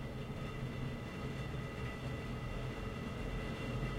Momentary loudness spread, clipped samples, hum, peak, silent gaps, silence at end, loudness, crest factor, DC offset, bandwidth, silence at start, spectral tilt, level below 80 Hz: 2 LU; under 0.1%; none; -26 dBFS; none; 0 s; -43 LUFS; 14 dB; under 0.1%; 16 kHz; 0 s; -6.5 dB/octave; -48 dBFS